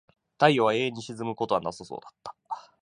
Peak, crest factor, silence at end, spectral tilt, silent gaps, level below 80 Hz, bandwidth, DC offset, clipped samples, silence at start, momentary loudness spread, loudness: -4 dBFS; 24 dB; 0.2 s; -5.5 dB/octave; none; -68 dBFS; 11 kHz; under 0.1%; under 0.1%; 0.4 s; 20 LU; -26 LUFS